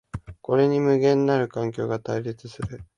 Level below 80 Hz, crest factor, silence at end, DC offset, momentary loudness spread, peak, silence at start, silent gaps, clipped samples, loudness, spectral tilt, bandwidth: -50 dBFS; 16 dB; 0.15 s; under 0.1%; 15 LU; -8 dBFS; 0.15 s; none; under 0.1%; -23 LUFS; -7.5 dB/octave; 10 kHz